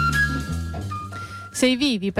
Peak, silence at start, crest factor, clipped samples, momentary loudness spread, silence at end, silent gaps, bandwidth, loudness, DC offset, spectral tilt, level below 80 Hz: -8 dBFS; 0 s; 14 dB; under 0.1%; 13 LU; 0 s; none; 16 kHz; -24 LUFS; under 0.1%; -4.5 dB/octave; -36 dBFS